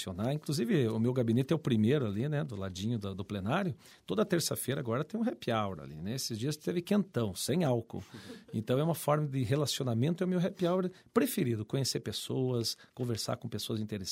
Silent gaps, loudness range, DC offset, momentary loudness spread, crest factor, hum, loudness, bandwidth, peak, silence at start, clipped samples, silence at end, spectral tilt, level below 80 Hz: none; 3 LU; under 0.1%; 8 LU; 20 dB; none; -33 LUFS; 16 kHz; -12 dBFS; 0 s; under 0.1%; 0 s; -5.5 dB/octave; -68 dBFS